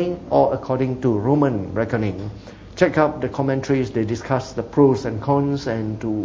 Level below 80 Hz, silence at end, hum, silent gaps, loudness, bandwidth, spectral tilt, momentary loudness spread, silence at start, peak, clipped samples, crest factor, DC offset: -44 dBFS; 0 s; none; none; -21 LUFS; 7.6 kHz; -7.5 dB/octave; 8 LU; 0 s; -2 dBFS; under 0.1%; 18 dB; under 0.1%